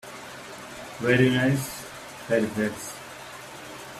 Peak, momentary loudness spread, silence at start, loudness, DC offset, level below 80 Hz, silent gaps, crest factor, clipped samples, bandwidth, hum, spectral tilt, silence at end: -8 dBFS; 19 LU; 0.05 s; -25 LUFS; under 0.1%; -58 dBFS; none; 20 dB; under 0.1%; 15 kHz; none; -5.5 dB/octave; 0 s